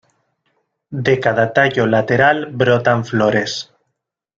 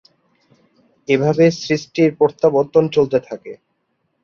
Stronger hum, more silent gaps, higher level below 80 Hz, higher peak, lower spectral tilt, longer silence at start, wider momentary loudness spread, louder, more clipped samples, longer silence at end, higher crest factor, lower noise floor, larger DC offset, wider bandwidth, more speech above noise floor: neither; neither; about the same, -54 dBFS vs -58 dBFS; about the same, 0 dBFS vs -2 dBFS; about the same, -6 dB/octave vs -6.5 dB/octave; second, 0.9 s vs 1.1 s; second, 10 LU vs 18 LU; about the same, -15 LUFS vs -16 LUFS; neither; about the same, 0.75 s vs 0.7 s; about the same, 16 dB vs 16 dB; first, -76 dBFS vs -69 dBFS; neither; about the same, 7.6 kHz vs 7.2 kHz; first, 61 dB vs 53 dB